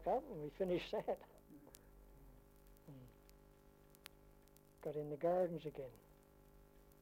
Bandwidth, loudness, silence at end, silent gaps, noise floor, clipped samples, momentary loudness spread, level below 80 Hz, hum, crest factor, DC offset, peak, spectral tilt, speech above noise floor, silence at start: 16.5 kHz; -43 LUFS; 0.1 s; none; -67 dBFS; under 0.1%; 27 LU; -68 dBFS; 50 Hz at -80 dBFS; 20 dB; under 0.1%; -28 dBFS; -7 dB/octave; 24 dB; 0 s